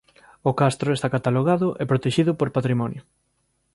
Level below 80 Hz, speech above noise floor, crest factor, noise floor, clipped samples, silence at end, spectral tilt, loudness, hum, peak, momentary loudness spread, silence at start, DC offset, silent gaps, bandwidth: -58 dBFS; 48 dB; 18 dB; -70 dBFS; under 0.1%; 0.75 s; -7 dB/octave; -22 LUFS; none; -6 dBFS; 6 LU; 0.45 s; under 0.1%; none; 11.5 kHz